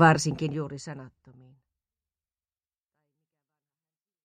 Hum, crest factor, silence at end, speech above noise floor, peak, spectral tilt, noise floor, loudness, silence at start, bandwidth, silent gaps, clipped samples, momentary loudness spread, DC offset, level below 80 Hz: none; 24 dB; 3.15 s; over 65 dB; -6 dBFS; -5.5 dB/octave; under -90 dBFS; -28 LUFS; 0 s; 10.5 kHz; none; under 0.1%; 21 LU; under 0.1%; -62 dBFS